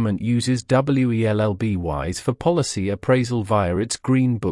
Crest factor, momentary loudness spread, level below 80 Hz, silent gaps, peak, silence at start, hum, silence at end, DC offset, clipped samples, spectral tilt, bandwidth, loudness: 14 dB; 5 LU; -46 dBFS; none; -6 dBFS; 0 s; none; 0 s; under 0.1%; under 0.1%; -6 dB/octave; 12 kHz; -21 LUFS